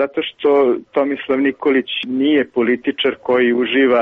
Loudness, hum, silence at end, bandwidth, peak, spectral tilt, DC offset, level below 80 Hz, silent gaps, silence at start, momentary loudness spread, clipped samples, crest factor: -17 LUFS; none; 0 s; 4.6 kHz; -4 dBFS; -7 dB/octave; under 0.1%; -60 dBFS; none; 0 s; 5 LU; under 0.1%; 12 dB